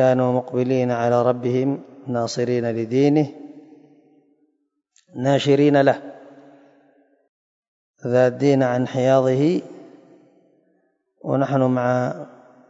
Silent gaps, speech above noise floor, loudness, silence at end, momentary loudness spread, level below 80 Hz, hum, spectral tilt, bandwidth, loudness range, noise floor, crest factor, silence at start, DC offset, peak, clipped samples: 7.29-7.94 s; 52 dB; -20 LUFS; 0.4 s; 14 LU; -70 dBFS; none; -7 dB/octave; 7.8 kHz; 3 LU; -71 dBFS; 18 dB; 0 s; under 0.1%; -4 dBFS; under 0.1%